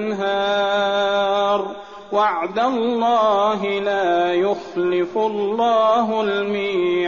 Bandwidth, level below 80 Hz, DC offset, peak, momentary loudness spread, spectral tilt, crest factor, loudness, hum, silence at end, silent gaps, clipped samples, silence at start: 7.2 kHz; -62 dBFS; 0.2%; -6 dBFS; 5 LU; -2.5 dB/octave; 12 dB; -19 LUFS; none; 0 s; none; under 0.1%; 0 s